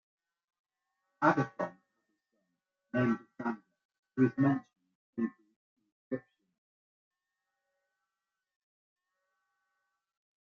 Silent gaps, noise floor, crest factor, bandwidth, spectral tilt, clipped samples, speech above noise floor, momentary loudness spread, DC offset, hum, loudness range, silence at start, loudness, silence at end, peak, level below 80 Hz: 3.85-3.89 s, 3.99-4.03 s, 4.95-5.13 s, 5.56-5.76 s, 5.92-6.11 s; -90 dBFS; 26 dB; 7 kHz; -7 dB/octave; under 0.1%; 59 dB; 13 LU; under 0.1%; none; 16 LU; 1.2 s; -33 LUFS; 4.2 s; -12 dBFS; -78 dBFS